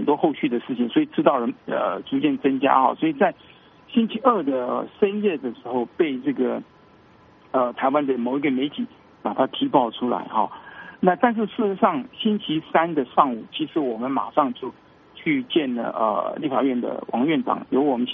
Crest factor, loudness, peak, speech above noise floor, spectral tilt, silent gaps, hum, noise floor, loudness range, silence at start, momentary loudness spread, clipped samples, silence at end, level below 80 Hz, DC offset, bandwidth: 22 dB; -23 LUFS; 0 dBFS; 30 dB; -4 dB/octave; none; none; -52 dBFS; 3 LU; 0 s; 7 LU; under 0.1%; 0 s; -68 dBFS; under 0.1%; 3.9 kHz